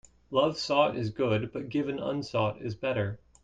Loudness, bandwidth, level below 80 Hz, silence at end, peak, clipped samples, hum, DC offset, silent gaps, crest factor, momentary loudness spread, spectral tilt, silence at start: -30 LUFS; 9.2 kHz; -60 dBFS; 0.25 s; -10 dBFS; under 0.1%; none; under 0.1%; none; 20 dB; 7 LU; -6 dB/octave; 0.3 s